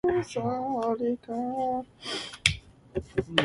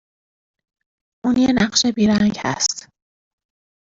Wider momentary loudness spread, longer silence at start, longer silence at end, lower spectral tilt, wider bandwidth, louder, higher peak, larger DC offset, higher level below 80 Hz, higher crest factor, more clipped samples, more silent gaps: about the same, 8 LU vs 6 LU; second, 0.05 s vs 1.25 s; second, 0 s vs 1.05 s; about the same, -4 dB/octave vs -3.5 dB/octave; first, 11.5 kHz vs 8 kHz; second, -30 LUFS vs -18 LUFS; about the same, -2 dBFS vs -2 dBFS; neither; about the same, -52 dBFS vs -50 dBFS; first, 28 dB vs 20 dB; neither; neither